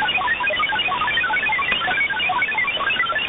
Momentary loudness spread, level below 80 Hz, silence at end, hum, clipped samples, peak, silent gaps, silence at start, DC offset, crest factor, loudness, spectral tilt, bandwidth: 1 LU; -50 dBFS; 0 s; none; under 0.1%; -6 dBFS; none; 0 s; under 0.1%; 16 dB; -19 LUFS; -6 dB/octave; 4 kHz